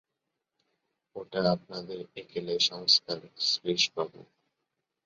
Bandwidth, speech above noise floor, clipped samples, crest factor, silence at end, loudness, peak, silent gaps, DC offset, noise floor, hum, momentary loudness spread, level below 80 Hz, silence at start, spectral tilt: 7.8 kHz; 55 dB; under 0.1%; 24 dB; 0.85 s; -28 LUFS; -10 dBFS; none; under 0.1%; -85 dBFS; none; 17 LU; -70 dBFS; 1.15 s; -3 dB/octave